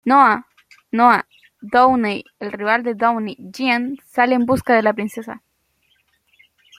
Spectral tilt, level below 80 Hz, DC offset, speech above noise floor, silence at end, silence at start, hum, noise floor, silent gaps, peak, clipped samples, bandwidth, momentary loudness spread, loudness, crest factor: -5.5 dB/octave; -58 dBFS; under 0.1%; 47 dB; 1.4 s; 0.05 s; none; -64 dBFS; none; -2 dBFS; under 0.1%; 15.5 kHz; 15 LU; -17 LUFS; 18 dB